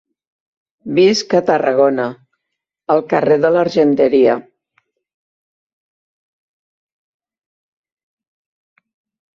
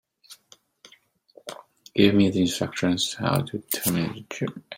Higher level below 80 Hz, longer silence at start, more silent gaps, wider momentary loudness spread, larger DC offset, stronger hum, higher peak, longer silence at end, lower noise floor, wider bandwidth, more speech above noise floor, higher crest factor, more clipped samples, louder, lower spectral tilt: about the same, -62 dBFS vs -60 dBFS; first, 0.85 s vs 0.3 s; neither; second, 10 LU vs 21 LU; neither; neither; about the same, -2 dBFS vs -4 dBFS; first, 4.95 s vs 0 s; first, -79 dBFS vs -59 dBFS; second, 7.6 kHz vs 16.5 kHz; first, 66 dB vs 35 dB; second, 16 dB vs 22 dB; neither; first, -14 LUFS vs -24 LUFS; about the same, -5.5 dB/octave vs -5 dB/octave